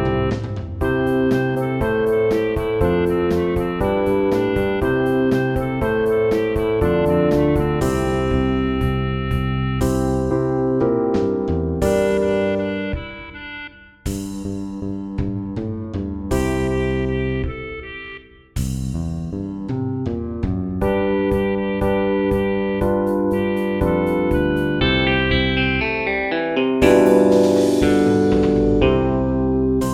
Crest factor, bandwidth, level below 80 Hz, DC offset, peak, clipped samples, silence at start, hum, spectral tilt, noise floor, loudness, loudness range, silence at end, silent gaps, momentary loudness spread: 18 dB; 15.5 kHz; -32 dBFS; under 0.1%; 0 dBFS; under 0.1%; 0 s; none; -7 dB/octave; -39 dBFS; -19 LUFS; 9 LU; 0 s; none; 11 LU